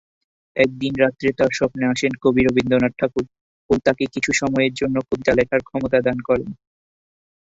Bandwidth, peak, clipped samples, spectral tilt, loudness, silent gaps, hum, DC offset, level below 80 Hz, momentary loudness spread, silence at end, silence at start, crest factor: 8 kHz; -2 dBFS; under 0.1%; -5.5 dB/octave; -20 LUFS; 3.41-3.69 s; none; under 0.1%; -46 dBFS; 5 LU; 1 s; 0.55 s; 18 dB